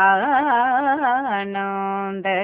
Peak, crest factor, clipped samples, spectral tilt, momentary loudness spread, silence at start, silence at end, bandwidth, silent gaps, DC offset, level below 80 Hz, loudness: -4 dBFS; 14 dB; under 0.1%; -8.5 dB/octave; 7 LU; 0 s; 0 s; 4 kHz; none; under 0.1%; -66 dBFS; -20 LUFS